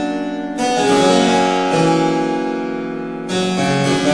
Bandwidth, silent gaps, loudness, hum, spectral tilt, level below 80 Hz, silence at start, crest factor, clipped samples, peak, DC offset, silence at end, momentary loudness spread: 10.5 kHz; none; -16 LUFS; none; -5 dB/octave; -54 dBFS; 0 s; 14 dB; under 0.1%; -2 dBFS; 0.3%; 0 s; 10 LU